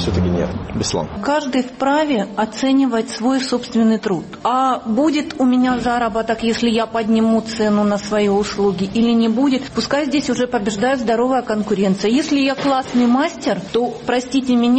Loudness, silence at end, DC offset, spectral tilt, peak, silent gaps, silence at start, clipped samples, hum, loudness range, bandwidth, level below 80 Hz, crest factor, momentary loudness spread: -18 LUFS; 0 s; under 0.1%; -5.5 dB/octave; -4 dBFS; none; 0 s; under 0.1%; none; 1 LU; 8.8 kHz; -42 dBFS; 12 dB; 5 LU